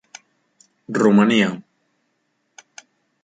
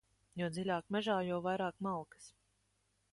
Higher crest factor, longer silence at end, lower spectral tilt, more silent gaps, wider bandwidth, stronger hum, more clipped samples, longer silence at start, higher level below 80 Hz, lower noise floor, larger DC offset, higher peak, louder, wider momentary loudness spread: about the same, 20 dB vs 18 dB; first, 1.65 s vs 0.85 s; about the same, -6 dB/octave vs -6 dB/octave; neither; second, 9.2 kHz vs 11.5 kHz; second, none vs 50 Hz at -65 dBFS; neither; first, 0.9 s vs 0.35 s; first, -64 dBFS vs -74 dBFS; second, -70 dBFS vs -79 dBFS; neither; first, -2 dBFS vs -22 dBFS; first, -17 LUFS vs -38 LUFS; about the same, 14 LU vs 15 LU